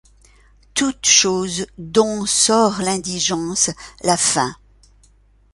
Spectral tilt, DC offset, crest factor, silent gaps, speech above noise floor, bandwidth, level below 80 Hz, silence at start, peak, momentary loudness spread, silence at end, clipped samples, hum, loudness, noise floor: -2 dB/octave; under 0.1%; 20 dB; none; 35 dB; 11.5 kHz; -50 dBFS; 0.75 s; 0 dBFS; 11 LU; 1 s; under 0.1%; none; -17 LUFS; -53 dBFS